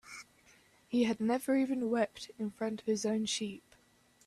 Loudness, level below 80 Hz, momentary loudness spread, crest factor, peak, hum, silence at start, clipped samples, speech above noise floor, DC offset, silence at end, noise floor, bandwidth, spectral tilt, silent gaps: -34 LUFS; -74 dBFS; 11 LU; 18 dB; -18 dBFS; none; 0.05 s; under 0.1%; 34 dB; under 0.1%; 0.7 s; -67 dBFS; 13.5 kHz; -4 dB/octave; none